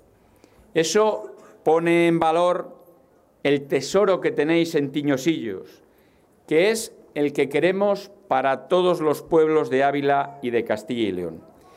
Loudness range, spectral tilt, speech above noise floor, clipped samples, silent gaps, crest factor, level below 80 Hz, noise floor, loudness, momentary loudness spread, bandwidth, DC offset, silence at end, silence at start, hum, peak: 3 LU; -5 dB/octave; 36 dB; under 0.1%; none; 16 dB; -64 dBFS; -57 dBFS; -22 LUFS; 9 LU; 15.5 kHz; under 0.1%; 0.35 s; 0.75 s; none; -8 dBFS